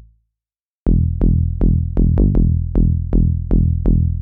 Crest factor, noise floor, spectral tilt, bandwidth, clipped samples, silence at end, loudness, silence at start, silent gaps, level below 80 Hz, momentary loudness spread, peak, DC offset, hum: 12 dB; under -90 dBFS; -14 dB/octave; 1.7 kHz; under 0.1%; 0 s; -17 LUFS; 0.85 s; none; -18 dBFS; 2 LU; -2 dBFS; under 0.1%; none